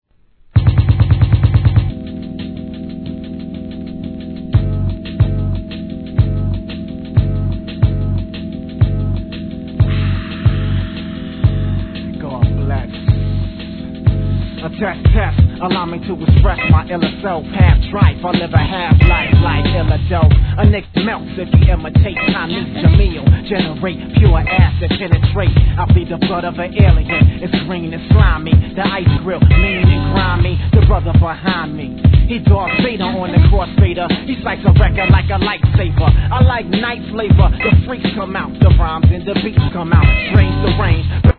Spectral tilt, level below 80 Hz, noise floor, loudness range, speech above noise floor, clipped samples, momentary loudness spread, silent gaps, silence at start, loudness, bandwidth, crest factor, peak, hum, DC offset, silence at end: -10.5 dB/octave; -18 dBFS; -48 dBFS; 6 LU; 37 dB; 0.2%; 12 LU; none; 0.55 s; -14 LUFS; 4.5 kHz; 12 dB; 0 dBFS; none; 0.2%; 0.05 s